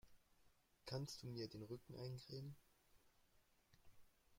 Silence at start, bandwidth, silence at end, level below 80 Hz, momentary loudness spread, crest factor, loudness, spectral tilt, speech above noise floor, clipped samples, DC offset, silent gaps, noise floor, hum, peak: 0.05 s; 16.5 kHz; 0 s; -78 dBFS; 9 LU; 22 dB; -53 LUFS; -5.5 dB/octave; 25 dB; under 0.1%; under 0.1%; none; -77 dBFS; none; -34 dBFS